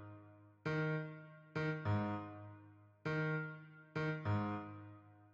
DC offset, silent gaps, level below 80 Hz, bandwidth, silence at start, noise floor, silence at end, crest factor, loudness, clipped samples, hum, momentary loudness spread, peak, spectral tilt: under 0.1%; none; -72 dBFS; 7.2 kHz; 0 s; -62 dBFS; 0.05 s; 16 dB; -42 LUFS; under 0.1%; none; 18 LU; -26 dBFS; -8.5 dB/octave